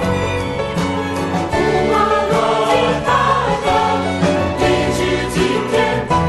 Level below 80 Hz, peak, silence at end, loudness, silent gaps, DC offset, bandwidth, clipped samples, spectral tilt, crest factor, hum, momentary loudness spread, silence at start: -34 dBFS; -4 dBFS; 0 s; -16 LUFS; none; under 0.1%; 12 kHz; under 0.1%; -5.5 dB/octave; 12 dB; none; 5 LU; 0 s